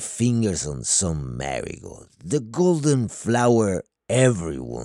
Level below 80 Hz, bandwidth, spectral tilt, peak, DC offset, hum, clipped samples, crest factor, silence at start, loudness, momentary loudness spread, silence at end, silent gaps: -46 dBFS; 12.5 kHz; -5 dB/octave; -4 dBFS; under 0.1%; none; under 0.1%; 18 dB; 0 s; -22 LUFS; 11 LU; 0 s; none